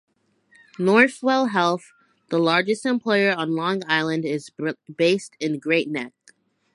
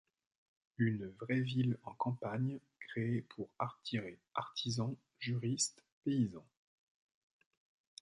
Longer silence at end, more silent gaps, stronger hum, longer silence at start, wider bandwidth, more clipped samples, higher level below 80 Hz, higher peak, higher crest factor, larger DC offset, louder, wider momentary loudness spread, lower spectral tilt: second, 0.65 s vs 1.6 s; second, none vs 5.92-6.02 s; neither; about the same, 0.8 s vs 0.8 s; about the same, 11.5 kHz vs 11 kHz; neither; about the same, -74 dBFS vs -74 dBFS; first, -2 dBFS vs -22 dBFS; about the same, 20 dB vs 18 dB; neither; first, -22 LUFS vs -39 LUFS; first, 12 LU vs 9 LU; about the same, -5 dB/octave vs -5 dB/octave